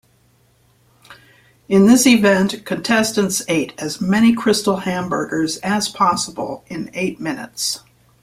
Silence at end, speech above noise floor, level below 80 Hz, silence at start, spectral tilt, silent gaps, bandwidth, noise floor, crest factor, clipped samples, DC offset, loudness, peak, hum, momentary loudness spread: 0.45 s; 40 dB; -54 dBFS; 1.1 s; -4 dB/octave; none; 16 kHz; -57 dBFS; 16 dB; under 0.1%; under 0.1%; -17 LUFS; -2 dBFS; none; 14 LU